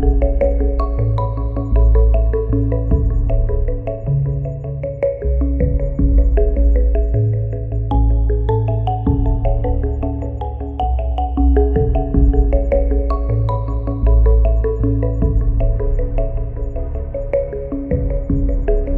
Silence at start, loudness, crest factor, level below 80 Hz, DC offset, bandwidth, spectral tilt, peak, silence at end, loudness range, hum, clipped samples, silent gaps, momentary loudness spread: 0 s; -18 LUFS; 14 dB; -16 dBFS; under 0.1%; 3.2 kHz; -12 dB/octave; -2 dBFS; 0 s; 3 LU; none; under 0.1%; none; 8 LU